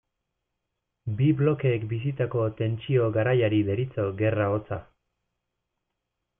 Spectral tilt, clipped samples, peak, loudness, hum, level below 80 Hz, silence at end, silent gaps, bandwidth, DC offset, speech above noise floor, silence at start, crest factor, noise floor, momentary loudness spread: -12 dB/octave; under 0.1%; -10 dBFS; -26 LUFS; none; -60 dBFS; 1.55 s; none; 3.7 kHz; under 0.1%; 57 dB; 1.05 s; 16 dB; -82 dBFS; 8 LU